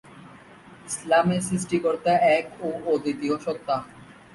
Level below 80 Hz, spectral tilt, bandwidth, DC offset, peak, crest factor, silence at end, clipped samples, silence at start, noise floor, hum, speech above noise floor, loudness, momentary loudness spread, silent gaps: -60 dBFS; -5 dB/octave; 11.5 kHz; under 0.1%; -8 dBFS; 16 dB; 0.25 s; under 0.1%; 0.1 s; -48 dBFS; none; 24 dB; -24 LUFS; 12 LU; none